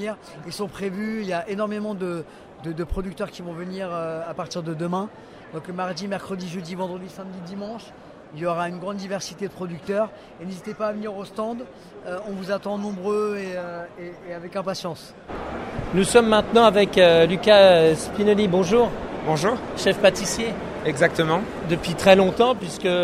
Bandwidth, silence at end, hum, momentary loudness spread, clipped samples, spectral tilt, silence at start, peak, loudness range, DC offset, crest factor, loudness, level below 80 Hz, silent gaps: 15 kHz; 0 s; none; 20 LU; under 0.1%; -5 dB/octave; 0 s; -2 dBFS; 14 LU; under 0.1%; 22 dB; -22 LUFS; -46 dBFS; none